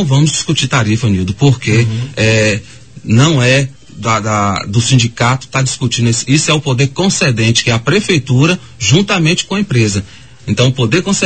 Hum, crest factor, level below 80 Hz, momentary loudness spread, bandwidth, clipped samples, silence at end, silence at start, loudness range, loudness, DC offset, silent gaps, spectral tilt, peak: none; 12 dB; -40 dBFS; 5 LU; 9 kHz; under 0.1%; 0 s; 0 s; 1 LU; -12 LUFS; 0.8%; none; -4.5 dB/octave; 0 dBFS